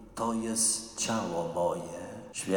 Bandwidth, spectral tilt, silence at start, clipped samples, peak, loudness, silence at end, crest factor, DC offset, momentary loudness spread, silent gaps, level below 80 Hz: 19 kHz; -3 dB/octave; 0 s; under 0.1%; -16 dBFS; -30 LUFS; 0 s; 16 dB; under 0.1%; 13 LU; none; -60 dBFS